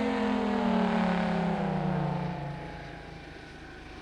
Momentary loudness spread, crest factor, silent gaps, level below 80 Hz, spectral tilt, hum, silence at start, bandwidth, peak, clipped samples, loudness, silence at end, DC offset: 18 LU; 14 dB; none; -50 dBFS; -7.5 dB/octave; none; 0 s; 9.8 kHz; -16 dBFS; under 0.1%; -29 LUFS; 0 s; under 0.1%